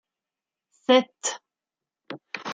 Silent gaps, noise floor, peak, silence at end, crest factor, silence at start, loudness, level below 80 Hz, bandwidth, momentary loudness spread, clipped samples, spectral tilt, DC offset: none; -90 dBFS; -4 dBFS; 0 s; 24 dB; 0.9 s; -24 LUFS; -80 dBFS; 9.6 kHz; 21 LU; under 0.1%; -2 dB/octave; under 0.1%